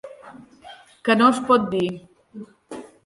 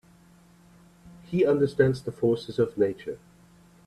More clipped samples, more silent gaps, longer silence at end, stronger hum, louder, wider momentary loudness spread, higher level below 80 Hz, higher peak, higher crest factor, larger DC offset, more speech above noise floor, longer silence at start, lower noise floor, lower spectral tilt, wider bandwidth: neither; neither; second, 0.2 s vs 0.7 s; neither; first, -19 LUFS vs -26 LUFS; first, 25 LU vs 14 LU; about the same, -64 dBFS vs -60 dBFS; first, -4 dBFS vs -8 dBFS; about the same, 20 dB vs 20 dB; neither; second, 27 dB vs 31 dB; second, 0.05 s vs 1.05 s; second, -46 dBFS vs -56 dBFS; second, -5.5 dB/octave vs -8 dB/octave; about the same, 11.5 kHz vs 12.5 kHz